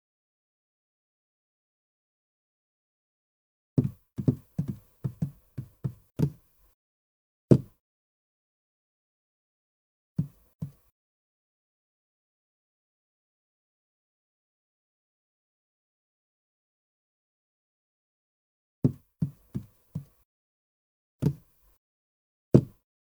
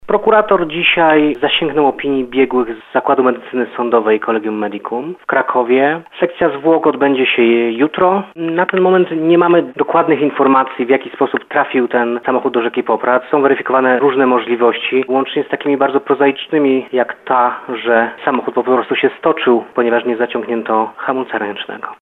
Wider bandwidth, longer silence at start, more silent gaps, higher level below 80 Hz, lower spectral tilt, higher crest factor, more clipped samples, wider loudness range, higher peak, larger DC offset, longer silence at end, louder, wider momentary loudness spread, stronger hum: first, over 20 kHz vs 4 kHz; first, 3.75 s vs 0.05 s; first, 6.74-7.48 s, 7.80-10.16 s, 10.55-10.59 s, 10.92-18.82 s, 20.25-21.19 s, 21.77-22.52 s vs none; about the same, -60 dBFS vs -56 dBFS; first, -10.5 dB/octave vs -8 dB/octave; first, 32 dB vs 14 dB; neither; first, 12 LU vs 3 LU; about the same, -2 dBFS vs 0 dBFS; neither; first, 0.35 s vs 0.1 s; second, -30 LUFS vs -14 LUFS; first, 19 LU vs 7 LU; neither